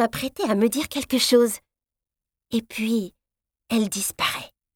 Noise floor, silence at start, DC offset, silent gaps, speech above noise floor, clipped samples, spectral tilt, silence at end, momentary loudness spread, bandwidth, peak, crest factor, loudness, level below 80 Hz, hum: -89 dBFS; 0 s; under 0.1%; none; 66 dB; under 0.1%; -3.5 dB/octave; 0.3 s; 10 LU; 18 kHz; -6 dBFS; 18 dB; -23 LUFS; -58 dBFS; none